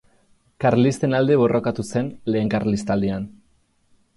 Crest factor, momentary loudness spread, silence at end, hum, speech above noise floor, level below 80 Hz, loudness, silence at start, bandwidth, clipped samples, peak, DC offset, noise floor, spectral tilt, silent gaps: 16 dB; 8 LU; 0.85 s; none; 42 dB; -50 dBFS; -21 LUFS; 0.6 s; 11.5 kHz; under 0.1%; -6 dBFS; under 0.1%; -62 dBFS; -7 dB/octave; none